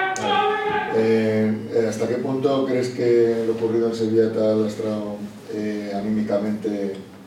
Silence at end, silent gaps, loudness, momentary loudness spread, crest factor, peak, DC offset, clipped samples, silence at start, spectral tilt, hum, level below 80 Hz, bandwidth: 0 s; none; -22 LUFS; 8 LU; 14 dB; -8 dBFS; under 0.1%; under 0.1%; 0 s; -6 dB/octave; none; -62 dBFS; 13.5 kHz